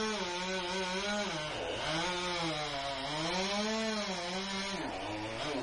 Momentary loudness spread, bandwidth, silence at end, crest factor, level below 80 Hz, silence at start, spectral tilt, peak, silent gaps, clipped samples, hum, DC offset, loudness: 4 LU; 11.5 kHz; 0 s; 14 dB; -58 dBFS; 0 s; -3 dB/octave; -22 dBFS; none; under 0.1%; none; under 0.1%; -35 LUFS